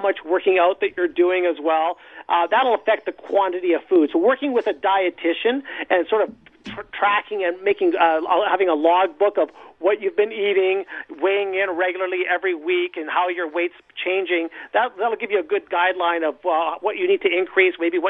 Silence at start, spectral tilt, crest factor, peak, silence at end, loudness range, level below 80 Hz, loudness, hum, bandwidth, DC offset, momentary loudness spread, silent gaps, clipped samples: 0 s; -6 dB/octave; 16 dB; -4 dBFS; 0 s; 3 LU; -68 dBFS; -20 LUFS; none; 4 kHz; under 0.1%; 7 LU; none; under 0.1%